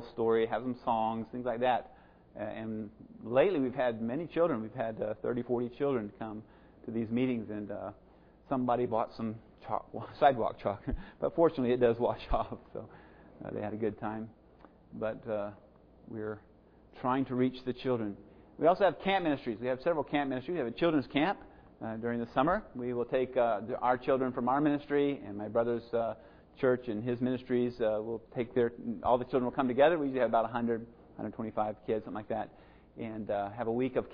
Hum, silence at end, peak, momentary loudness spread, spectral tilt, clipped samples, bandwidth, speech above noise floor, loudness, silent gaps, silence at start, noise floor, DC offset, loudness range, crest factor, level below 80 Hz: none; 0 s; -12 dBFS; 14 LU; -5.5 dB/octave; under 0.1%; 5.2 kHz; 27 dB; -33 LUFS; none; 0 s; -59 dBFS; under 0.1%; 6 LU; 22 dB; -56 dBFS